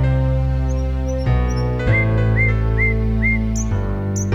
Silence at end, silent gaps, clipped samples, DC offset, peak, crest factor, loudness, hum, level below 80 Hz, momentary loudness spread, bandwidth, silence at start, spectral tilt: 0 s; none; under 0.1%; under 0.1%; -6 dBFS; 12 dB; -19 LUFS; none; -22 dBFS; 5 LU; 7.8 kHz; 0 s; -6.5 dB/octave